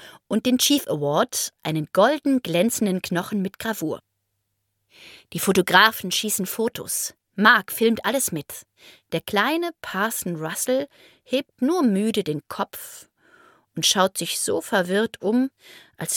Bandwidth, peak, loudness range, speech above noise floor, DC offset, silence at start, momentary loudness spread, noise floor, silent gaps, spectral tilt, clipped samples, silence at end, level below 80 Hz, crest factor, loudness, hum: 17.5 kHz; 0 dBFS; 6 LU; 53 dB; under 0.1%; 0 s; 12 LU; -76 dBFS; none; -3 dB/octave; under 0.1%; 0 s; -64 dBFS; 22 dB; -22 LUFS; none